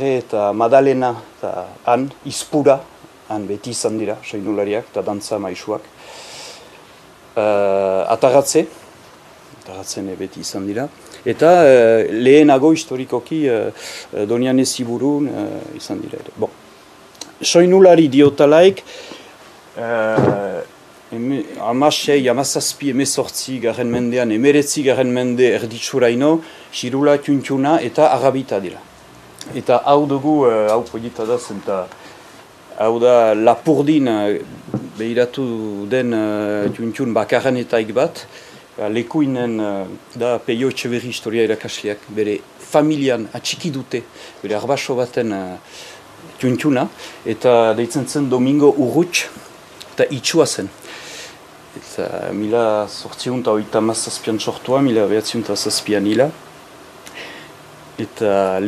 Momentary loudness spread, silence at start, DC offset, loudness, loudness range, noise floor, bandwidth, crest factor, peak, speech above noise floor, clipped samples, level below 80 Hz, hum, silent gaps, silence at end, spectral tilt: 17 LU; 0 s; under 0.1%; -17 LUFS; 8 LU; -44 dBFS; 14.5 kHz; 18 dB; 0 dBFS; 27 dB; under 0.1%; -60 dBFS; none; none; 0 s; -5 dB/octave